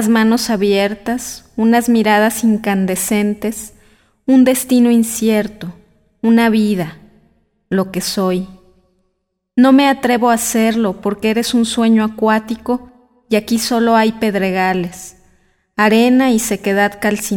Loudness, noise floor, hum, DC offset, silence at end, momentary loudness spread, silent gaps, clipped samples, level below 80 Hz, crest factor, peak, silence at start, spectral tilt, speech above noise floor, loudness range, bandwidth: -14 LUFS; -70 dBFS; none; under 0.1%; 0 s; 11 LU; none; under 0.1%; -48 dBFS; 14 dB; -2 dBFS; 0 s; -4.5 dB/octave; 56 dB; 4 LU; 18 kHz